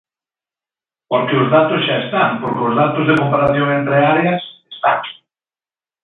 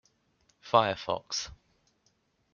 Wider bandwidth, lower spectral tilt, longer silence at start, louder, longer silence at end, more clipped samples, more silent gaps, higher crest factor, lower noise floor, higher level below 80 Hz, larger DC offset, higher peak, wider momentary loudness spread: second, 6 kHz vs 7.2 kHz; first, -8.5 dB/octave vs -3 dB/octave; first, 1.1 s vs 0.65 s; first, -15 LUFS vs -29 LUFS; about the same, 0.9 s vs 1 s; neither; neither; second, 16 dB vs 26 dB; first, under -90 dBFS vs -72 dBFS; first, -54 dBFS vs -64 dBFS; neither; first, 0 dBFS vs -6 dBFS; about the same, 7 LU vs 9 LU